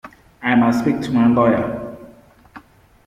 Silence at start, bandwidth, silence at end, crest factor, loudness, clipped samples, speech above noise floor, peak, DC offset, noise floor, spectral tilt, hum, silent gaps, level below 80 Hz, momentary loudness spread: 0.05 s; 11 kHz; 0.45 s; 16 dB; -17 LUFS; under 0.1%; 31 dB; -2 dBFS; under 0.1%; -46 dBFS; -7.5 dB/octave; none; none; -50 dBFS; 13 LU